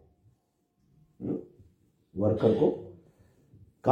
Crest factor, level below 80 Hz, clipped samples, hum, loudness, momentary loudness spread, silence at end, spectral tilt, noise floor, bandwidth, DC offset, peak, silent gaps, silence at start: 24 dB; -64 dBFS; under 0.1%; none; -29 LUFS; 18 LU; 0 s; -10 dB/octave; -74 dBFS; 7 kHz; under 0.1%; -6 dBFS; none; 1.2 s